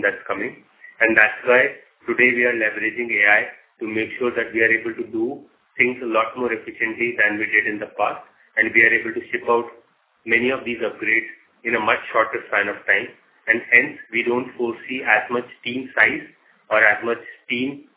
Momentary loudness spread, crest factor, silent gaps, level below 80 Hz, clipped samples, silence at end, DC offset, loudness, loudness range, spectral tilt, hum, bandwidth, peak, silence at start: 13 LU; 22 dB; none; -64 dBFS; under 0.1%; 0.15 s; under 0.1%; -19 LUFS; 4 LU; -7 dB/octave; none; 4 kHz; 0 dBFS; 0 s